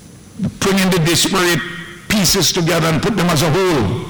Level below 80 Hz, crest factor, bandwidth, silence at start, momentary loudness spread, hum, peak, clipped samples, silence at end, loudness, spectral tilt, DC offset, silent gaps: -38 dBFS; 10 dB; over 20 kHz; 0.05 s; 9 LU; none; -4 dBFS; under 0.1%; 0 s; -14 LUFS; -4 dB/octave; under 0.1%; none